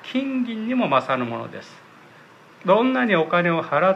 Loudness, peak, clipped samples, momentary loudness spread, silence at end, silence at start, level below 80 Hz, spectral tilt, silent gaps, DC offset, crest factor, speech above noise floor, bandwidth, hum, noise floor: -21 LUFS; -6 dBFS; under 0.1%; 12 LU; 0 s; 0 s; -76 dBFS; -7 dB/octave; none; under 0.1%; 16 dB; 27 dB; 8.2 kHz; none; -48 dBFS